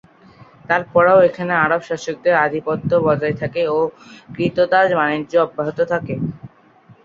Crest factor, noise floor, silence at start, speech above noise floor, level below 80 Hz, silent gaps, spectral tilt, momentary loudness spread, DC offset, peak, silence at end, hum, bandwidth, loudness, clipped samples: 16 dB; -49 dBFS; 0.7 s; 32 dB; -54 dBFS; none; -6.5 dB/octave; 10 LU; under 0.1%; -2 dBFS; 0.6 s; none; 7.4 kHz; -18 LUFS; under 0.1%